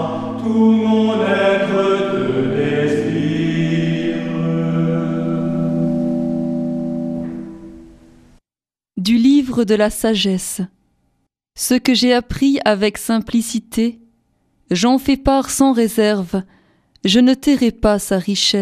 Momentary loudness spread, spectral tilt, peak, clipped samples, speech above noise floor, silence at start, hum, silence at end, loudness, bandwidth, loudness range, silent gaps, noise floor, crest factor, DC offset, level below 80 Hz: 9 LU; -5 dB/octave; 0 dBFS; under 0.1%; over 75 dB; 0 s; none; 0 s; -17 LUFS; 15.5 kHz; 4 LU; none; under -90 dBFS; 16 dB; under 0.1%; -40 dBFS